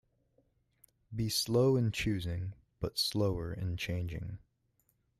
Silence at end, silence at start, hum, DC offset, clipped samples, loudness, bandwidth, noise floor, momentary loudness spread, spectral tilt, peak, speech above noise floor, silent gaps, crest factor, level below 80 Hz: 0.85 s; 1.1 s; none; under 0.1%; under 0.1%; -33 LUFS; 15 kHz; -76 dBFS; 15 LU; -5 dB/octave; -18 dBFS; 43 dB; none; 16 dB; -54 dBFS